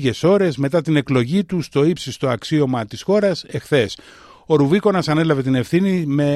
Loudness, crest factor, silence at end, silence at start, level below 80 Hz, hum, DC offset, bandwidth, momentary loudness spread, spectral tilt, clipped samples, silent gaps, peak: -18 LUFS; 14 dB; 0 s; 0 s; -52 dBFS; none; under 0.1%; 13 kHz; 6 LU; -6.5 dB/octave; under 0.1%; none; -2 dBFS